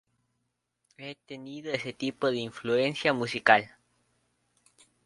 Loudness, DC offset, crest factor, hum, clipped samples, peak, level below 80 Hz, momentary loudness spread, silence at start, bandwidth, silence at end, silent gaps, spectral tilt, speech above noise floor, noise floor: -27 LUFS; under 0.1%; 28 dB; 60 Hz at -55 dBFS; under 0.1%; -4 dBFS; -72 dBFS; 21 LU; 1 s; 11.5 kHz; 1.35 s; none; -5 dB/octave; 51 dB; -80 dBFS